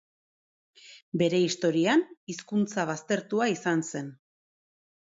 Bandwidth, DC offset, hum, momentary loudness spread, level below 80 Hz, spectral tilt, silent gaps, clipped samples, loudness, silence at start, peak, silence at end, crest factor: 8 kHz; under 0.1%; none; 13 LU; -74 dBFS; -5 dB/octave; 1.02-1.12 s, 2.17-2.27 s; under 0.1%; -28 LUFS; 0.85 s; -12 dBFS; 1 s; 18 dB